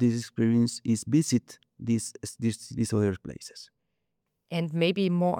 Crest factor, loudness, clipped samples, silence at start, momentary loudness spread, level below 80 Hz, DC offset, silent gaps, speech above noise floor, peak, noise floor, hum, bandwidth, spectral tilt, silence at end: 16 dB; -28 LUFS; under 0.1%; 0 s; 13 LU; -66 dBFS; under 0.1%; none; 54 dB; -12 dBFS; -81 dBFS; none; 16.5 kHz; -6 dB/octave; 0 s